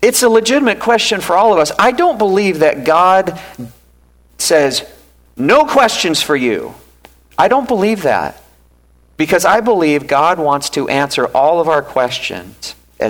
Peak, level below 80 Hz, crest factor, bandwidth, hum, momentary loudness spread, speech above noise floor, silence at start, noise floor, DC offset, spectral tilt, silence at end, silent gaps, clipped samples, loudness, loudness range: 0 dBFS; -48 dBFS; 12 dB; 19.5 kHz; none; 12 LU; 37 dB; 0 s; -49 dBFS; under 0.1%; -3.5 dB/octave; 0 s; none; under 0.1%; -13 LUFS; 3 LU